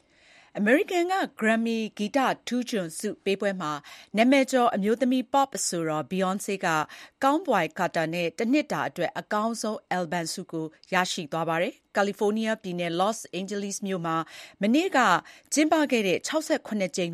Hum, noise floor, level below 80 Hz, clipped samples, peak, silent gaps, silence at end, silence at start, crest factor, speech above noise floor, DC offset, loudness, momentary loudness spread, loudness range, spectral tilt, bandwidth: none; -57 dBFS; -74 dBFS; under 0.1%; -6 dBFS; none; 0 s; 0.55 s; 20 dB; 31 dB; under 0.1%; -26 LUFS; 9 LU; 3 LU; -4 dB/octave; 14.5 kHz